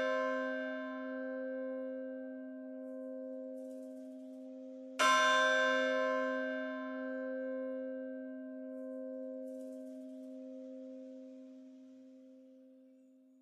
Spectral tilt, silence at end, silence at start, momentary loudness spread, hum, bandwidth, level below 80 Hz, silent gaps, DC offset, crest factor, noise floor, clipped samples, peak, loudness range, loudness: -1 dB/octave; 0.35 s; 0 s; 21 LU; none; 13.5 kHz; under -90 dBFS; none; under 0.1%; 22 dB; -63 dBFS; under 0.1%; -18 dBFS; 17 LU; -37 LUFS